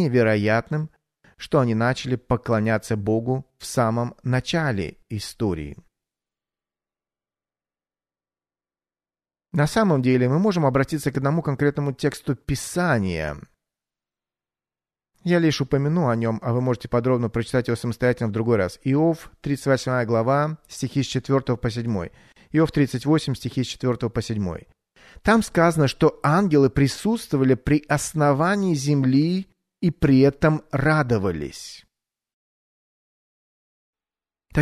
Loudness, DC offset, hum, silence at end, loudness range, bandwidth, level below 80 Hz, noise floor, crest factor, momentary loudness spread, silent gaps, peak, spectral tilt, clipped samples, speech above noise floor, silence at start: -22 LUFS; under 0.1%; none; 0 s; 7 LU; 13.5 kHz; -46 dBFS; under -90 dBFS; 18 dB; 10 LU; 32.33-33.93 s; -4 dBFS; -6.5 dB/octave; under 0.1%; over 69 dB; 0 s